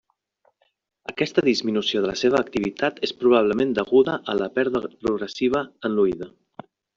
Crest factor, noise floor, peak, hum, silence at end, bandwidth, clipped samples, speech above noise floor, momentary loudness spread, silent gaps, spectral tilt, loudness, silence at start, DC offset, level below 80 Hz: 18 dB; -70 dBFS; -6 dBFS; none; 0.7 s; 7.4 kHz; under 0.1%; 48 dB; 8 LU; none; -5 dB/octave; -22 LUFS; 1.1 s; under 0.1%; -58 dBFS